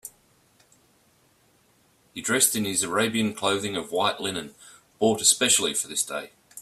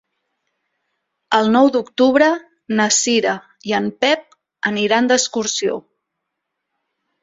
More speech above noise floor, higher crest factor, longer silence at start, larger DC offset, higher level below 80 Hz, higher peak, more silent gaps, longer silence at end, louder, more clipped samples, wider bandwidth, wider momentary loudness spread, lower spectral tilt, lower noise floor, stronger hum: second, 38 dB vs 61 dB; first, 24 dB vs 18 dB; second, 0.05 s vs 1.3 s; neither; about the same, -66 dBFS vs -62 dBFS; second, -4 dBFS vs 0 dBFS; neither; second, 0 s vs 1.4 s; second, -23 LUFS vs -17 LUFS; neither; first, 15.5 kHz vs 8 kHz; first, 16 LU vs 10 LU; about the same, -2 dB/octave vs -2.5 dB/octave; second, -63 dBFS vs -78 dBFS; neither